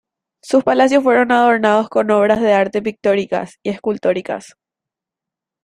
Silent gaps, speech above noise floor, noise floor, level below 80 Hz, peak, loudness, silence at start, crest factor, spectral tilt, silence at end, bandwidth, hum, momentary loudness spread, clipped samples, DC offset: none; 71 dB; -85 dBFS; -58 dBFS; 0 dBFS; -15 LUFS; 0.45 s; 16 dB; -5.5 dB/octave; 1.2 s; 11 kHz; none; 10 LU; under 0.1%; under 0.1%